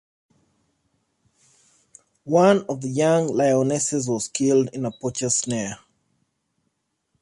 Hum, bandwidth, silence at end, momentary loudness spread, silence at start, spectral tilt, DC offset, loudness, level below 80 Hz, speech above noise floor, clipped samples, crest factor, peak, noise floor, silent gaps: none; 11.5 kHz; 1.45 s; 10 LU; 2.25 s; -5 dB/octave; under 0.1%; -21 LUFS; -64 dBFS; 54 dB; under 0.1%; 20 dB; -4 dBFS; -74 dBFS; none